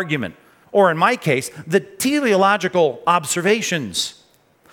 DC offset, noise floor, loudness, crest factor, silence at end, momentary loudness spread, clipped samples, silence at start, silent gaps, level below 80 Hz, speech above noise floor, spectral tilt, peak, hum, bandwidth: under 0.1%; -55 dBFS; -18 LUFS; 18 dB; 0.6 s; 8 LU; under 0.1%; 0 s; none; -66 dBFS; 36 dB; -4 dB/octave; -2 dBFS; none; 19 kHz